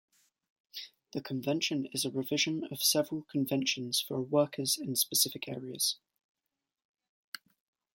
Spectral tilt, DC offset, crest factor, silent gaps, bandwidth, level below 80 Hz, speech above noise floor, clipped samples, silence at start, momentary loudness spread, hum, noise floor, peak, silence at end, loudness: -3 dB/octave; under 0.1%; 22 dB; none; 17 kHz; -78 dBFS; 56 dB; under 0.1%; 0.75 s; 17 LU; none; -89 dBFS; -12 dBFS; 2 s; -31 LUFS